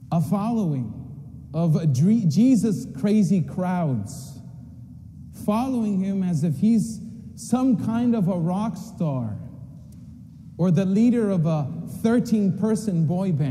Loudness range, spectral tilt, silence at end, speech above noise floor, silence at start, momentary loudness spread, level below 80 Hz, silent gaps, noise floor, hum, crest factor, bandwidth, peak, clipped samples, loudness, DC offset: 4 LU; -8 dB/octave; 0 s; 21 dB; 0 s; 22 LU; -54 dBFS; none; -42 dBFS; none; 14 dB; 14 kHz; -8 dBFS; under 0.1%; -23 LUFS; under 0.1%